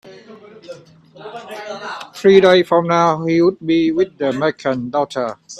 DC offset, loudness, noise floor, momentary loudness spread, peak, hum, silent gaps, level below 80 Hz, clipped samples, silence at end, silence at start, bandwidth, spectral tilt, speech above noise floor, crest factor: under 0.1%; -15 LUFS; -40 dBFS; 20 LU; 0 dBFS; none; none; -58 dBFS; under 0.1%; 0 s; 0.05 s; 11.5 kHz; -6 dB/octave; 25 dB; 16 dB